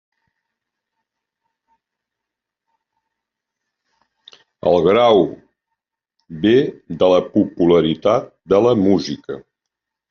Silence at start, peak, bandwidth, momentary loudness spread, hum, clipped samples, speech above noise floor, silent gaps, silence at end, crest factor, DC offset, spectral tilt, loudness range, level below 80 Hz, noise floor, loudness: 4.65 s; -2 dBFS; 6.8 kHz; 13 LU; none; under 0.1%; 68 dB; none; 0.7 s; 16 dB; under 0.1%; -5.5 dB/octave; 4 LU; -56 dBFS; -83 dBFS; -16 LUFS